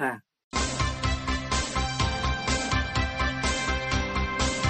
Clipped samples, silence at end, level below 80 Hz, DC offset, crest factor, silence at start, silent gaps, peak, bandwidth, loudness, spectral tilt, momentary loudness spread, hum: under 0.1%; 0 s; -34 dBFS; under 0.1%; 16 dB; 0 s; 0.44-0.51 s; -10 dBFS; 9.4 kHz; -27 LUFS; -3.5 dB/octave; 3 LU; none